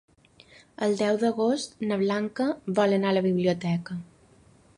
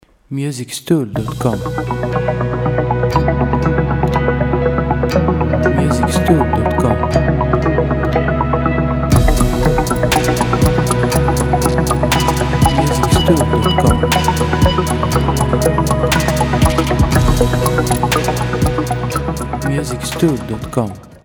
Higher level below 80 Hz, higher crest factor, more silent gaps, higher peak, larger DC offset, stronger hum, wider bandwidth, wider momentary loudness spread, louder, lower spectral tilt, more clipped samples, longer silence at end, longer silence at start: second, -66 dBFS vs -22 dBFS; about the same, 18 dB vs 14 dB; neither; second, -10 dBFS vs 0 dBFS; neither; neither; second, 11 kHz vs over 20 kHz; about the same, 6 LU vs 6 LU; second, -26 LUFS vs -15 LUFS; about the same, -6.5 dB/octave vs -6 dB/octave; neither; first, 0.75 s vs 0.1 s; first, 0.8 s vs 0.3 s